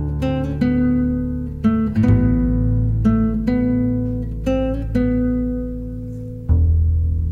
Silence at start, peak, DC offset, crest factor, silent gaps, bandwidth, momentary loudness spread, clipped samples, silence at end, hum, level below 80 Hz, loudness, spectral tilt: 0 s; -4 dBFS; under 0.1%; 14 dB; none; 6.6 kHz; 9 LU; under 0.1%; 0 s; none; -24 dBFS; -19 LUFS; -10 dB/octave